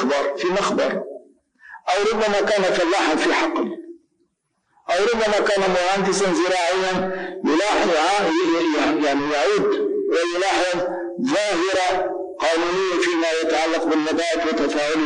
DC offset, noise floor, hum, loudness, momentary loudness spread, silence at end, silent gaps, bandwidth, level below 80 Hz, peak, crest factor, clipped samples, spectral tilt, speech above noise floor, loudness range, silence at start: 0.2%; -70 dBFS; none; -20 LUFS; 6 LU; 0 s; none; 10.5 kHz; -54 dBFS; -12 dBFS; 10 dB; under 0.1%; -3.5 dB/octave; 50 dB; 2 LU; 0 s